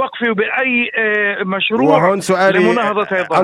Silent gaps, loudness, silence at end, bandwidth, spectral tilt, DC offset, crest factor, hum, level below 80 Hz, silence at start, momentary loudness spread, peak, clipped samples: none; -14 LUFS; 0 s; 13.5 kHz; -5 dB/octave; under 0.1%; 14 dB; none; -60 dBFS; 0 s; 5 LU; 0 dBFS; under 0.1%